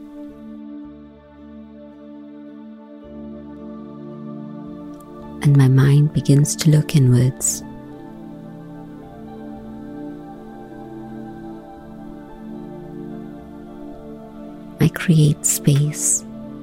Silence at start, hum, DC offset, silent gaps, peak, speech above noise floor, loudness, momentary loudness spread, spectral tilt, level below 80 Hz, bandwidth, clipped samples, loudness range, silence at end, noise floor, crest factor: 0 s; none; under 0.1%; none; -2 dBFS; 27 dB; -16 LUFS; 23 LU; -5.5 dB/octave; -48 dBFS; 16 kHz; under 0.1%; 20 LU; 0 s; -42 dBFS; 18 dB